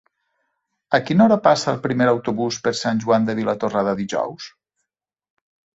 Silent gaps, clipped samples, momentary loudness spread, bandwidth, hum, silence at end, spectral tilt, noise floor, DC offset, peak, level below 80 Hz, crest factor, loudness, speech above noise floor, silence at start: none; under 0.1%; 9 LU; 8 kHz; none; 1.25 s; -5.5 dB/octave; -82 dBFS; under 0.1%; -2 dBFS; -60 dBFS; 18 dB; -19 LUFS; 63 dB; 0.9 s